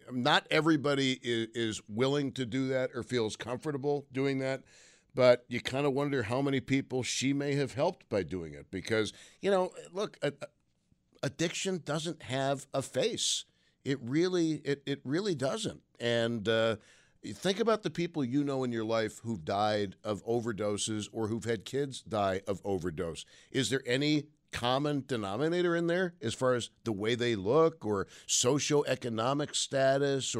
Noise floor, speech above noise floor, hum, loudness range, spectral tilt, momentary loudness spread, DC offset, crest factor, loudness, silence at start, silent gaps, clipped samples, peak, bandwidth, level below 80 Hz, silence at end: -72 dBFS; 41 dB; none; 4 LU; -4.5 dB/octave; 9 LU; under 0.1%; 20 dB; -32 LUFS; 0.05 s; none; under 0.1%; -12 dBFS; 15 kHz; -66 dBFS; 0 s